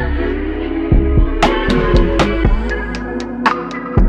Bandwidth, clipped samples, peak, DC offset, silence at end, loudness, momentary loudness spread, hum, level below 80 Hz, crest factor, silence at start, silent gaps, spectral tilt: 9 kHz; under 0.1%; 0 dBFS; under 0.1%; 0 s; -16 LUFS; 8 LU; none; -18 dBFS; 14 dB; 0 s; none; -7 dB/octave